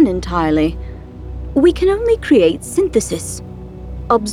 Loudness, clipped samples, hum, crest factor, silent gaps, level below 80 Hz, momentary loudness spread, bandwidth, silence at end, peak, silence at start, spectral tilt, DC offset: -16 LUFS; under 0.1%; none; 14 dB; none; -30 dBFS; 19 LU; 15 kHz; 0 s; -2 dBFS; 0 s; -5.5 dB/octave; under 0.1%